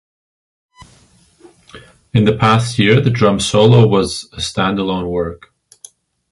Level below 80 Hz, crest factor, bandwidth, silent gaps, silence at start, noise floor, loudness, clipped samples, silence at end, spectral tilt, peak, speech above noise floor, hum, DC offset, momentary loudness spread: -42 dBFS; 16 dB; 11.5 kHz; none; 0.8 s; -50 dBFS; -14 LUFS; under 0.1%; 0.95 s; -6 dB/octave; 0 dBFS; 37 dB; none; under 0.1%; 12 LU